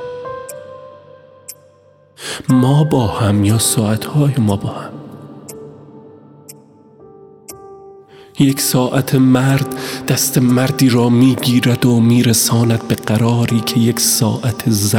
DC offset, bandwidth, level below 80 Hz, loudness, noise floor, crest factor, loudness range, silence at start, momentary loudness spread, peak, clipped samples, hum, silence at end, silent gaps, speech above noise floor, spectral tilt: under 0.1%; 19 kHz; -50 dBFS; -14 LUFS; -49 dBFS; 16 dB; 9 LU; 0 s; 22 LU; 0 dBFS; under 0.1%; none; 0 s; none; 35 dB; -5 dB/octave